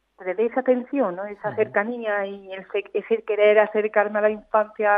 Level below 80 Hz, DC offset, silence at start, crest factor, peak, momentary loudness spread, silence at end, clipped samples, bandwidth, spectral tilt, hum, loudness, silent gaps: -70 dBFS; under 0.1%; 0.2 s; 18 dB; -4 dBFS; 12 LU; 0 s; under 0.1%; 3.8 kHz; -8 dB/octave; none; -23 LUFS; none